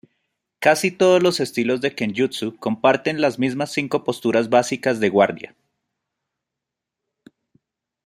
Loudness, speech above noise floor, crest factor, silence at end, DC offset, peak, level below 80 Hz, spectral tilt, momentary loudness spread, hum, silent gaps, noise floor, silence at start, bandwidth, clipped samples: -20 LUFS; 65 dB; 20 dB; 2.6 s; under 0.1%; -2 dBFS; -66 dBFS; -4.5 dB/octave; 7 LU; none; none; -84 dBFS; 0.6 s; 16 kHz; under 0.1%